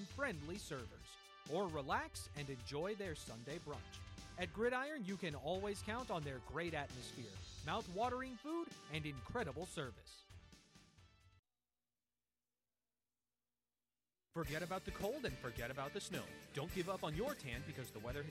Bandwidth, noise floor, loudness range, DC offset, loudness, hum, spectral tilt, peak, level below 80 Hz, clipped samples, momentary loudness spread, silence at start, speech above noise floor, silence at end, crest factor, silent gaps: 16 kHz; under -90 dBFS; 7 LU; under 0.1%; -45 LUFS; 60 Hz at -75 dBFS; -5 dB/octave; -28 dBFS; -62 dBFS; under 0.1%; 11 LU; 0 s; over 45 dB; 0 s; 18 dB; 11.39-11.43 s